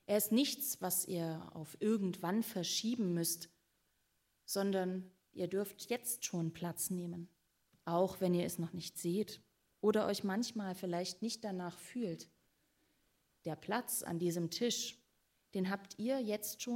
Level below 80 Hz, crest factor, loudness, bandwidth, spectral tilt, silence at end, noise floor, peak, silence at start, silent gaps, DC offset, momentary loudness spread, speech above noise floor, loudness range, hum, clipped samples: -80 dBFS; 18 dB; -38 LUFS; 16 kHz; -4.5 dB/octave; 0 s; -80 dBFS; -20 dBFS; 0.1 s; none; under 0.1%; 11 LU; 42 dB; 4 LU; none; under 0.1%